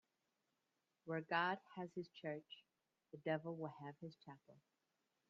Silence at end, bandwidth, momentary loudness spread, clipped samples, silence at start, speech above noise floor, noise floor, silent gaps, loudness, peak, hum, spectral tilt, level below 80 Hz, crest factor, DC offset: 0.7 s; 7.2 kHz; 21 LU; under 0.1%; 1.05 s; 42 dB; -89 dBFS; none; -46 LUFS; -24 dBFS; none; -3.5 dB/octave; under -90 dBFS; 24 dB; under 0.1%